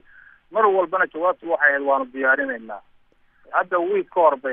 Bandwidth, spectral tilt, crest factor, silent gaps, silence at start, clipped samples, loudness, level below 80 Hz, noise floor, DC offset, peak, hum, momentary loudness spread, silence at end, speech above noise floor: 3.7 kHz; -8 dB/octave; 18 dB; none; 0.5 s; under 0.1%; -20 LUFS; -66 dBFS; -57 dBFS; under 0.1%; -4 dBFS; none; 10 LU; 0 s; 37 dB